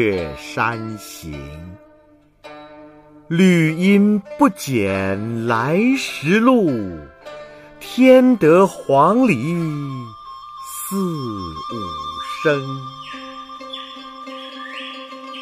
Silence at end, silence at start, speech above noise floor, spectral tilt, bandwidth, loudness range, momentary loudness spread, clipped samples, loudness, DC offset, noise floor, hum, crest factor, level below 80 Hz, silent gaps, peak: 0 s; 0 s; 35 dB; -6 dB/octave; 15.5 kHz; 11 LU; 21 LU; under 0.1%; -17 LUFS; under 0.1%; -52 dBFS; none; 18 dB; -50 dBFS; none; -2 dBFS